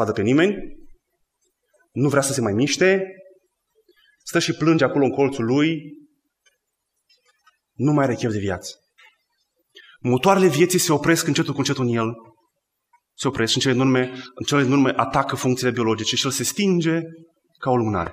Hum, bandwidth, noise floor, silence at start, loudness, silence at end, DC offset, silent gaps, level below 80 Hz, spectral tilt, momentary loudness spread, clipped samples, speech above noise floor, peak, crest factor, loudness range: none; 15.5 kHz; -76 dBFS; 0 s; -20 LUFS; 0 s; under 0.1%; none; -54 dBFS; -4.5 dB/octave; 11 LU; under 0.1%; 57 dB; -2 dBFS; 18 dB; 5 LU